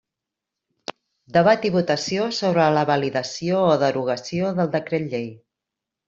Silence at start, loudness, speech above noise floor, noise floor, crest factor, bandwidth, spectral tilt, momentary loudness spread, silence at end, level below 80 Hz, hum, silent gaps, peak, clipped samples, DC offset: 1.3 s; -21 LUFS; 65 dB; -85 dBFS; 18 dB; 7.8 kHz; -5.5 dB/octave; 14 LU; 0.7 s; -62 dBFS; none; none; -4 dBFS; under 0.1%; under 0.1%